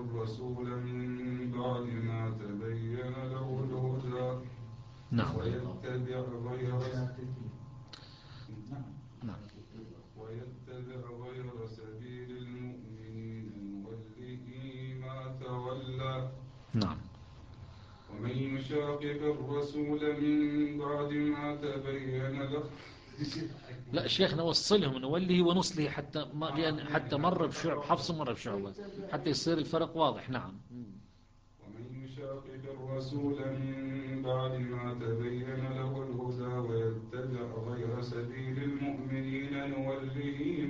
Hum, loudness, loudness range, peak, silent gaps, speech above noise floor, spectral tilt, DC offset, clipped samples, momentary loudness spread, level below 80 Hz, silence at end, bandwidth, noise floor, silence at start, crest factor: none; -36 LUFS; 14 LU; -14 dBFS; none; 28 dB; -6 dB/octave; under 0.1%; under 0.1%; 17 LU; -60 dBFS; 0 s; 9.4 kHz; -61 dBFS; 0 s; 22 dB